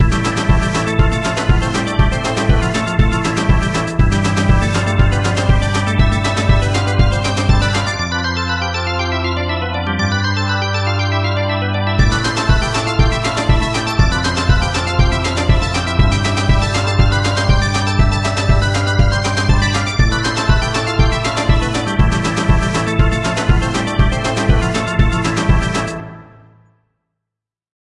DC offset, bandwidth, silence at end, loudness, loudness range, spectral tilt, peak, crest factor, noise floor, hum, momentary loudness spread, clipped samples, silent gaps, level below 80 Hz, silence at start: under 0.1%; 11.5 kHz; 1.75 s; -16 LUFS; 2 LU; -5 dB/octave; 0 dBFS; 14 dB; -83 dBFS; none; 3 LU; under 0.1%; none; -20 dBFS; 0 s